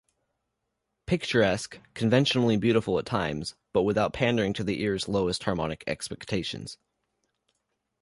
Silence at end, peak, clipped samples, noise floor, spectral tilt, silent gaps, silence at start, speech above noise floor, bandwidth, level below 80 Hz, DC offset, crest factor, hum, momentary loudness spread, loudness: 1.25 s; -10 dBFS; under 0.1%; -81 dBFS; -5.5 dB/octave; none; 1.1 s; 54 dB; 11.5 kHz; -52 dBFS; under 0.1%; 20 dB; none; 11 LU; -27 LUFS